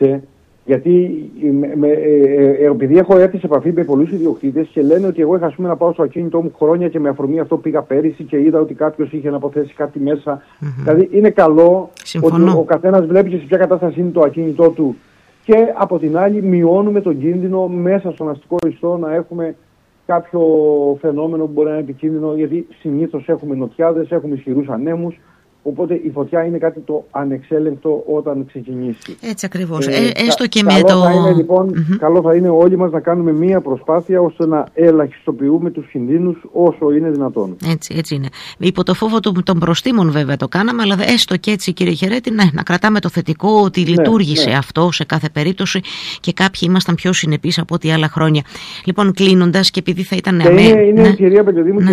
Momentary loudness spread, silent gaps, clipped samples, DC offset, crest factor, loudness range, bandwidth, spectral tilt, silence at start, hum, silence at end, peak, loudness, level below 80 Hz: 10 LU; none; under 0.1%; under 0.1%; 14 dB; 7 LU; 14 kHz; -6.5 dB/octave; 0 s; none; 0 s; 0 dBFS; -14 LUFS; -50 dBFS